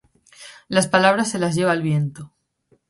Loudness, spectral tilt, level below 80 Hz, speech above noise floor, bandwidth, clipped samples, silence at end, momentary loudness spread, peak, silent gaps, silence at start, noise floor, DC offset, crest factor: -19 LUFS; -5 dB/octave; -60 dBFS; 44 dB; 11.5 kHz; under 0.1%; 0.65 s; 9 LU; -2 dBFS; none; 0.4 s; -63 dBFS; under 0.1%; 20 dB